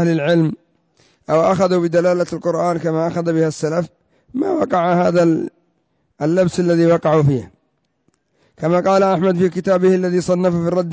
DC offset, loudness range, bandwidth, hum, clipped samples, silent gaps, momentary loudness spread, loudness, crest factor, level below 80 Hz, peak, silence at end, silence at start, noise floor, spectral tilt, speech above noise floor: under 0.1%; 2 LU; 8 kHz; none; under 0.1%; none; 8 LU; -17 LUFS; 12 dB; -52 dBFS; -6 dBFS; 0 s; 0 s; -67 dBFS; -7.5 dB/octave; 51 dB